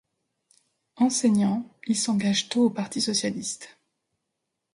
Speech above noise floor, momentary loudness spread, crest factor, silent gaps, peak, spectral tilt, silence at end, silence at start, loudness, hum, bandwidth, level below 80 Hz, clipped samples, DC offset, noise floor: 57 dB; 10 LU; 16 dB; none; -10 dBFS; -4 dB/octave; 1.05 s; 1 s; -25 LUFS; none; 11.5 kHz; -70 dBFS; under 0.1%; under 0.1%; -82 dBFS